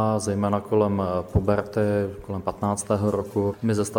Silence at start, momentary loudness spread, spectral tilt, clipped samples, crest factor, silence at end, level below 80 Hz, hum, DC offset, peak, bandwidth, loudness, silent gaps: 0 s; 5 LU; -7 dB/octave; under 0.1%; 16 dB; 0 s; -44 dBFS; none; under 0.1%; -6 dBFS; 17 kHz; -25 LUFS; none